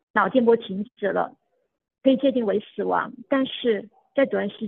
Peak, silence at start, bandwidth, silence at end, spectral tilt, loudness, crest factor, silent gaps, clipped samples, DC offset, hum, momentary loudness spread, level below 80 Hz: -4 dBFS; 0.15 s; 4.2 kHz; 0 s; -9 dB/octave; -24 LUFS; 18 dB; none; under 0.1%; under 0.1%; none; 8 LU; -72 dBFS